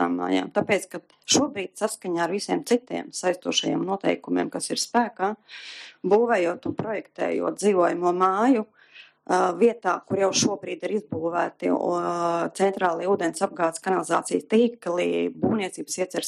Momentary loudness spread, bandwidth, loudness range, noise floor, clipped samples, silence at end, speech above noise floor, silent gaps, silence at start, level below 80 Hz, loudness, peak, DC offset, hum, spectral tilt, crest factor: 8 LU; 13.5 kHz; 2 LU; -51 dBFS; under 0.1%; 0 s; 27 dB; none; 0 s; -72 dBFS; -24 LUFS; -6 dBFS; under 0.1%; none; -4 dB/octave; 18 dB